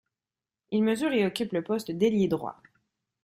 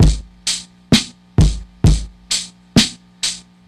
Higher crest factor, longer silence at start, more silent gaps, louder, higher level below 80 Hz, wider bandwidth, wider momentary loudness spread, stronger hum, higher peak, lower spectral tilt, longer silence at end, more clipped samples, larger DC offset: about the same, 16 dB vs 18 dB; first, 0.7 s vs 0 s; neither; second, -27 LUFS vs -18 LUFS; second, -66 dBFS vs -22 dBFS; about the same, 15.5 kHz vs 14.5 kHz; about the same, 7 LU vs 7 LU; second, none vs 60 Hz at -35 dBFS; second, -12 dBFS vs 0 dBFS; first, -6 dB/octave vs -4 dB/octave; first, 0.7 s vs 0.3 s; neither; neither